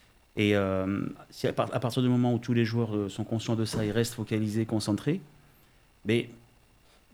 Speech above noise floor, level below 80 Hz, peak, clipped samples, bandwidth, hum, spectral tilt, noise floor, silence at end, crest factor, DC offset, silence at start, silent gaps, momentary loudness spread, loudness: 32 dB; -60 dBFS; -12 dBFS; under 0.1%; 19.5 kHz; none; -6.5 dB/octave; -61 dBFS; 0.75 s; 18 dB; under 0.1%; 0.35 s; none; 8 LU; -29 LUFS